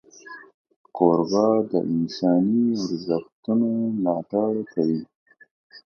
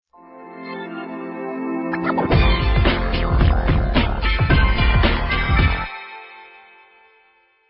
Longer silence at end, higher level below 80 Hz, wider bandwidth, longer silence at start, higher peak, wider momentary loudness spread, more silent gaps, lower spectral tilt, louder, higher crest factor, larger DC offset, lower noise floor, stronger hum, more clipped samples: second, 0.05 s vs 1.25 s; second, -66 dBFS vs -22 dBFS; first, 6.8 kHz vs 5.6 kHz; about the same, 0.25 s vs 0.3 s; about the same, -4 dBFS vs -2 dBFS; second, 13 LU vs 16 LU; first, 0.54-0.65 s, 0.76-0.84 s, 3.32-3.43 s, 5.15-5.26 s, 5.51-5.70 s vs none; second, -7.5 dB/octave vs -11 dB/octave; second, -23 LUFS vs -19 LUFS; about the same, 20 dB vs 16 dB; neither; second, -44 dBFS vs -58 dBFS; neither; neither